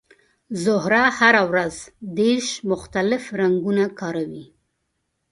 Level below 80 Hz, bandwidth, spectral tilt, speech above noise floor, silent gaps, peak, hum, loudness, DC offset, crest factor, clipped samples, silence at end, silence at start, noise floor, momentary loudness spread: -56 dBFS; 11.5 kHz; -4.5 dB/octave; 54 dB; none; 0 dBFS; none; -20 LUFS; under 0.1%; 22 dB; under 0.1%; 0.9 s; 0.5 s; -74 dBFS; 16 LU